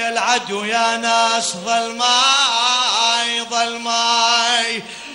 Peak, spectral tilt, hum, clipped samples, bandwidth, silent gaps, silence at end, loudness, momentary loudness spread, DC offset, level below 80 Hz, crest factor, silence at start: -2 dBFS; 0 dB/octave; none; under 0.1%; 16 kHz; none; 0 s; -16 LUFS; 7 LU; under 0.1%; -66 dBFS; 16 dB; 0 s